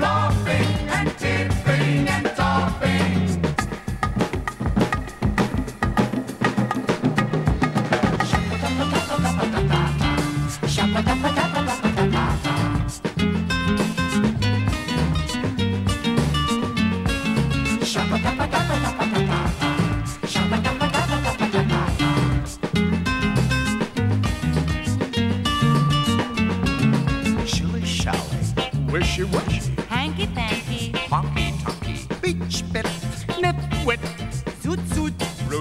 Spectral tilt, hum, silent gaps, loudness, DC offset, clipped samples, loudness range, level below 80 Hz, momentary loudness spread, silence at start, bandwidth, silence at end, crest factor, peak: -5.5 dB/octave; none; none; -22 LUFS; under 0.1%; under 0.1%; 3 LU; -34 dBFS; 5 LU; 0 s; 15 kHz; 0 s; 16 dB; -6 dBFS